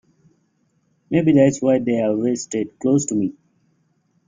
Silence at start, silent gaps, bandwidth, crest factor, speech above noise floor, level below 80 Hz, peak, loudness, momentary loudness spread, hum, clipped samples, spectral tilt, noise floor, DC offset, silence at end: 1.1 s; none; 9.6 kHz; 18 dB; 47 dB; -60 dBFS; -2 dBFS; -19 LUFS; 9 LU; none; under 0.1%; -6.5 dB/octave; -65 dBFS; under 0.1%; 0.95 s